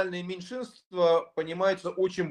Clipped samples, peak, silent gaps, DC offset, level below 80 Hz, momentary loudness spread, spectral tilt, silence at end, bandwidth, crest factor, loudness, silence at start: under 0.1%; -12 dBFS; 0.86-0.91 s; under 0.1%; -72 dBFS; 13 LU; -5.5 dB/octave; 0 s; 9.8 kHz; 16 dB; -29 LUFS; 0 s